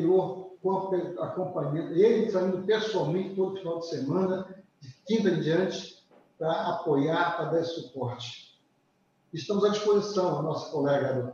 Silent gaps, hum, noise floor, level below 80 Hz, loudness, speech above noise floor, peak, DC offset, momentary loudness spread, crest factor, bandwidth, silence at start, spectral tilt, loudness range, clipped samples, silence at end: none; none; -69 dBFS; -72 dBFS; -28 LUFS; 42 dB; -12 dBFS; under 0.1%; 10 LU; 16 dB; 7.4 kHz; 0 s; -6.5 dB/octave; 3 LU; under 0.1%; 0 s